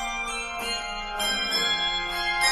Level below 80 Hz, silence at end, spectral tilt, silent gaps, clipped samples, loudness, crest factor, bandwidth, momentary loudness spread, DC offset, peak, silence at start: -46 dBFS; 0 s; 0 dB/octave; none; under 0.1%; -25 LUFS; 16 dB; 16 kHz; 7 LU; under 0.1%; -10 dBFS; 0 s